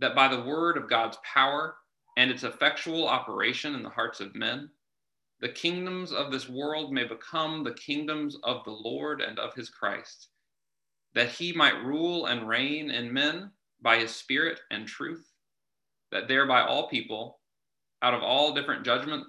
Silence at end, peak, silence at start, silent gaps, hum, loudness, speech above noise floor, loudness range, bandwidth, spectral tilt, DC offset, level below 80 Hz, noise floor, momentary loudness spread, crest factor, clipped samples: 0 s; -6 dBFS; 0 s; none; none; -28 LUFS; 61 dB; 6 LU; 12 kHz; -4 dB/octave; under 0.1%; -78 dBFS; -90 dBFS; 12 LU; 24 dB; under 0.1%